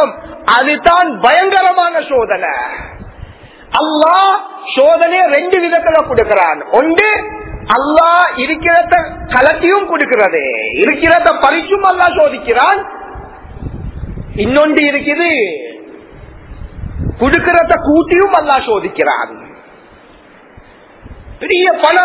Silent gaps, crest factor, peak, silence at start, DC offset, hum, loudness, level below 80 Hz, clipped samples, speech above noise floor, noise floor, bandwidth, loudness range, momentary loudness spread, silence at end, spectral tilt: none; 12 dB; 0 dBFS; 0 s; under 0.1%; none; -11 LUFS; -34 dBFS; 0.5%; 30 dB; -40 dBFS; 4 kHz; 4 LU; 16 LU; 0 s; -8.5 dB/octave